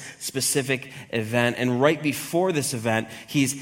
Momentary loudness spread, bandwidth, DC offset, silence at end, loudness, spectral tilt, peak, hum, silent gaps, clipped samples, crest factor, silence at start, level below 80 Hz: 7 LU; 17 kHz; under 0.1%; 0 s; -24 LUFS; -4 dB/octave; -4 dBFS; none; none; under 0.1%; 20 dB; 0 s; -64 dBFS